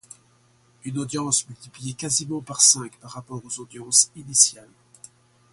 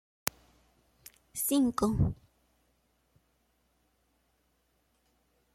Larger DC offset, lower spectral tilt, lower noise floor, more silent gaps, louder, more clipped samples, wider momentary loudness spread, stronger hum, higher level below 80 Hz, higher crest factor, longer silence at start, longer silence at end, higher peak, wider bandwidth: neither; second, -1.5 dB/octave vs -5.5 dB/octave; second, -60 dBFS vs -74 dBFS; neither; first, -19 LUFS vs -31 LUFS; neither; first, 21 LU vs 13 LU; neither; second, -66 dBFS vs -52 dBFS; second, 26 dB vs 32 dB; second, 0.85 s vs 1.35 s; second, 0.9 s vs 3.4 s; first, 0 dBFS vs -4 dBFS; second, 12 kHz vs 16.5 kHz